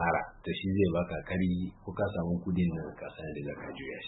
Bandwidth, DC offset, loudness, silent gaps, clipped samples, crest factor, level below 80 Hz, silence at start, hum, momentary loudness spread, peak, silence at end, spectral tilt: 4.1 kHz; under 0.1%; -33 LUFS; none; under 0.1%; 18 dB; -52 dBFS; 0 s; none; 12 LU; -14 dBFS; 0 s; -11 dB/octave